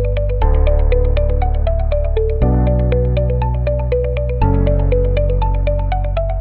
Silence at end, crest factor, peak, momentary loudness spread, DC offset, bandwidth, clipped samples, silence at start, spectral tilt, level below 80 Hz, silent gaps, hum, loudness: 0 s; 12 dB; -2 dBFS; 3 LU; 0.8%; 4.3 kHz; under 0.1%; 0 s; -11.5 dB/octave; -16 dBFS; none; none; -17 LUFS